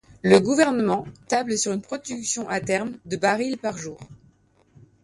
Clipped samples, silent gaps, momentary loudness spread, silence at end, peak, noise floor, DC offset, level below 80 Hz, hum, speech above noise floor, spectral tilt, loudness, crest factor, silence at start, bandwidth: under 0.1%; none; 13 LU; 0.9 s; -4 dBFS; -59 dBFS; under 0.1%; -60 dBFS; none; 36 dB; -4 dB/octave; -23 LUFS; 22 dB; 0.25 s; 11.5 kHz